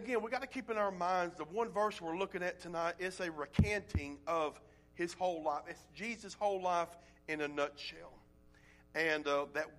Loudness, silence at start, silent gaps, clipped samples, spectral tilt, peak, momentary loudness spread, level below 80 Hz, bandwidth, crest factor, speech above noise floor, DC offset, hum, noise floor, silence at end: -38 LUFS; 0 s; none; under 0.1%; -5.5 dB/octave; -18 dBFS; 9 LU; -56 dBFS; 14 kHz; 20 dB; 26 dB; under 0.1%; none; -63 dBFS; 0 s